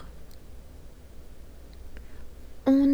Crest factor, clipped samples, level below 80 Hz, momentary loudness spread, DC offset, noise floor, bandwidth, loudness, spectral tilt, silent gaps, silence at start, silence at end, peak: 18 dB; under 0.1%; -46 dBFS; 25 LU; under 0.1%; -45 dBFS; 7.8 kHz; -25 LUFS; -7.5 dB/octave; none; 0 s; 0 s; -10 dBFS